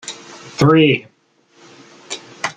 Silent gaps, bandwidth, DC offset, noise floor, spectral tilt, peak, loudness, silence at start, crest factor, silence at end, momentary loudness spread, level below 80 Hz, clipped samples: none; 9.6 kHz; under 0.1%; -54 dBFS; -5.5 dB/octave; -2 dBFS; -14 LUFS; 0.05 s; 18 dB; 0.05 s; 20 LU; -54 dBFS; under 0.1%